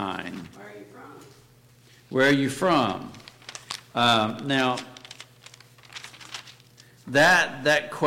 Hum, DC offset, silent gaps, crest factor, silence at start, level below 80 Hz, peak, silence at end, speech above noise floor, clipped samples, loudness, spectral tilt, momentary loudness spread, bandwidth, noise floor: none; under 0.1%; none; 16 dB; 0 s; -62 dBFS; -10 dBFS; 0 s; 32 dB; under 0.1%; -22 LUFS; -4 dB/octave; 24 LU; 16.5 kHz; -55 dBFS